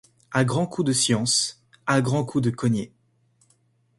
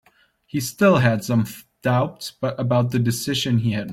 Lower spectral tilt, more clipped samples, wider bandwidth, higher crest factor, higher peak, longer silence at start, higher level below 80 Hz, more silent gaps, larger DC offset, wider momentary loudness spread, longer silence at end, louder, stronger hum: second, -4 dB/octave vs -6 dB/octave; neither; second, 11.5 kHz vs 16.5 kHz; about the same, 20 dB vs 18 dB; about the same, -6 dBFS vs -4 dBFS; second, 0.3 s vs 0.55 s; about the same, -60 dBFS vs -56 dBFS; neither; neither; about the same, 8 LU vs 10 LU; first, 1.1 s vs 0 s; about the same, -23 LUFS vs -21 LUFS; neither